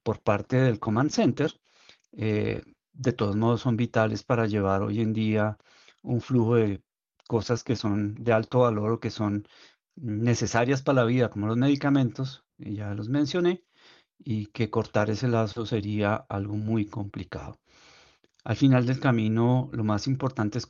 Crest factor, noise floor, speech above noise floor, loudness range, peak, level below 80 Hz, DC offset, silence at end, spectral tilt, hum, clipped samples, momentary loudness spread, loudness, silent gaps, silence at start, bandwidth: 18 dB; -60 dBFS; 34 dB; 3 LU; -8 dBFS; -60 dBFS; under 0.1%; 0.05 s; -7 dB/octave; none; under 0.1%; 12 LU; -26 LUFS; none; 0.05 s; 7.4 kHz